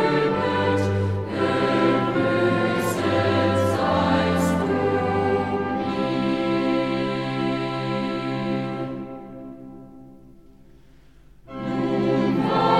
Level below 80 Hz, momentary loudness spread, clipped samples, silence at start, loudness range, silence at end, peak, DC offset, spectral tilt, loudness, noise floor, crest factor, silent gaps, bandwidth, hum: -52 dBFS; 11 LU; under 0.1%; 0 s; 11 LU; 0 s; -8 dBFS; 0.2%; -6.5 dB/octave; -22 LUFS; -52 dBFS; 14 dB; none; 15 kHz; 50 Hz at -45 dBFS